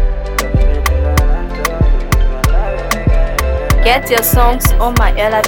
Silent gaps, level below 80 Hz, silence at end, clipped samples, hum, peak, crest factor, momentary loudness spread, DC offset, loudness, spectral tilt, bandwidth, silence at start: none; -12 dBFS; 0 s; under 0.1%; none; 0 dBFS; 12 dB; 6 LU; under 0.1%; -14 LUFS; -4.5 dB/octave; 19.5 kHz; 0 s